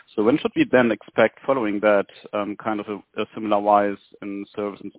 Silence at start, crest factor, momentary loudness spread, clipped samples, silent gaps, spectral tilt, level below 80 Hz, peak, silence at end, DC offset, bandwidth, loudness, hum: 0.15 s; 20 dB; 13 LU; under 0.1%; none; -10 dB/octave; -60 dBFS; -2 dBFS; 0.1 s; under 0.1%; 4 kHz; -22 LUFS; none